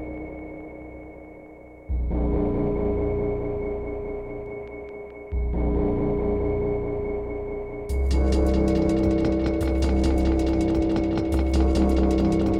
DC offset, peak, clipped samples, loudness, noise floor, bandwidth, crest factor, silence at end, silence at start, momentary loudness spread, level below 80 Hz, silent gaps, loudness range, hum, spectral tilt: under 0.1%; -10 dBFS; under 0.1%; -24 LUFS; -44 dBFS; 10 kHz; 14 dB; 0 s; 0 s; 16 LU; -28 dBFS; none; 6 LU; none; -8 dB/octave